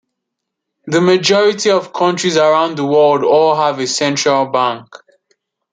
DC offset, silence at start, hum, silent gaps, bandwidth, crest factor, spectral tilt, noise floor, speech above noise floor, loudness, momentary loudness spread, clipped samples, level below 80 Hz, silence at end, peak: under 0.1%; 0.85 s; none; none; 9.6 kHz; 14 dB; -4 dB/octave; -77 dBFS; 64 dB; -13 LUFS; 5 LU; under 0.1%; -64 dBFS; 0.9 s; 0 dBFS